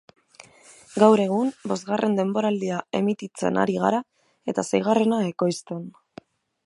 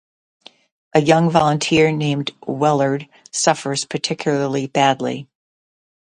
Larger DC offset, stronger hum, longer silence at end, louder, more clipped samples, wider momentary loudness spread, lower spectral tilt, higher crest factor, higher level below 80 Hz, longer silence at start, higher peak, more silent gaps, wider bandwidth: neither; neither; second, 0.75 s vs 0.9 s; second, -23 LUFS vs -18 LUFS; neither; first, 13 LU vs 10 LU; first, -6 dB/octave vs -4.5 dB/octave; about the same, 22 dB vs 18 dB; second, -68 dBFS vs -58 dBFS; about the same, 0.9 s vs 0.95 s; about the same, -2 dBFS vs 0 dBFS; neither; about the same, 11.5 kHz vs 11 kHz